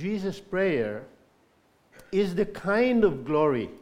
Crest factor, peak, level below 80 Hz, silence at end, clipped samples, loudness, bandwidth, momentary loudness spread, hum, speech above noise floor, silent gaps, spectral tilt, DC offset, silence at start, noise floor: 18 dB; -10 dBFS; -54 dBFS; 0.05 s; under 0.1%; -26 LUFS; 13.5 kHz; 9 LU; none; 38 dB; none; -7 dB/octave; under 0.1%; 0 s; -64 dBFS